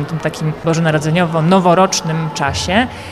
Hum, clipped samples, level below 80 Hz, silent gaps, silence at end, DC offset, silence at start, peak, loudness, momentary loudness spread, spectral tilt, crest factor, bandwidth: none; under 0.1%; -40 dBFS; none; 0 s; 0.2%; 0 s; -2 dBFS; -15 LUFS; 8 LU; -5 dB/octave; 12 dB; 13.5 kHz